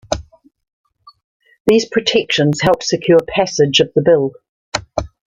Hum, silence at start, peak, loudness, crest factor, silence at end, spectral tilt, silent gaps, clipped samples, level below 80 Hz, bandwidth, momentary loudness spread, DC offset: none; 0.1 s; 0 dBFS; -15 LUFS; 16 dB; 0.25 s; -4.5 dB/octave; 0.73-0.84 s, 1.24-1.40 s, 1.60-1.65 s, 4.49-4.72 s; under 0.1%; -42 dBFS; 14 kHz; 12 LU; under 0.1%